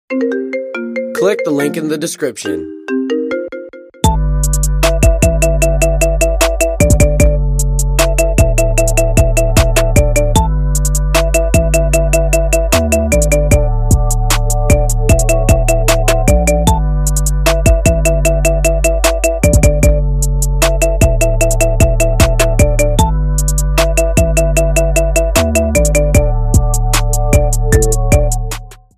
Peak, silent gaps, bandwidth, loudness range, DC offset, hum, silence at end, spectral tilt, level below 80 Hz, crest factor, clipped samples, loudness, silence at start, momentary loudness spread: 0 dBFS; none; 15.5 kHz; 3 LU; under 0.1%; none; 0.25 s; -5 dB/octave; -14 dBFS; 10 dB; under 0.1%; -13 LUFS; 0.1 s; 6 LU